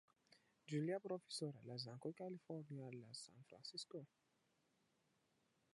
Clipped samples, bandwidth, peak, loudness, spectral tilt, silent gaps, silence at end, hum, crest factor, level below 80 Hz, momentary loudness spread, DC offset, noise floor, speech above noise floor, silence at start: under 0.1%; 11.5 kHz; -34 dBFS; -51 LUFS; -5.5 dB/octave; none; 1.7 s; none; 18 dB; under -90 dBFS; 12 LU; under 0.1%; -83 dBFS; 33 dB; 0.3 s